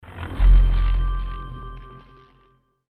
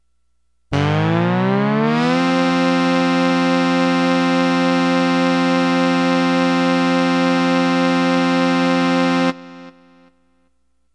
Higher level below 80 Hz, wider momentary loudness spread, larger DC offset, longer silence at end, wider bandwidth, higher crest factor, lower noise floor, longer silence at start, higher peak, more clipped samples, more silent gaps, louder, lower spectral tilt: first, -20 dBFS vs -56 dBFS; first, 22 LU vs 1 LU; neither; second, 0.95 s vs 1.25 s; second, 4 kHz vs 10.5 kHz; about the same, 14 dB vs 12 dB; second, -61 dBFS vs -69 dBFS; second, 0.1 s vs 0.7 s; about the same, -6 dBFS vs -4 dBFS; neither; neither; second, -22 LUFS vs -16 LUFS; first, -8 dB/octave vs -6 dB/octave